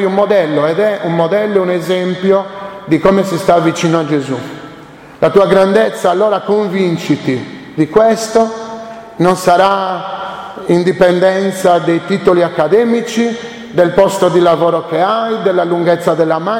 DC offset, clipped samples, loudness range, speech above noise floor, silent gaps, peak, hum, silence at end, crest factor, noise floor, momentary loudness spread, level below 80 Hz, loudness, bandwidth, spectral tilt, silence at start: under 0.1%; under 0.1%; 2 LU; 23 dB; none; 0 dBFS; none; 0 s; 12 dB; -35 dBFS; 11 LU; -48 dBFS; -12 LUFS; 16.5 kHz; -6 dB/octave; 0 s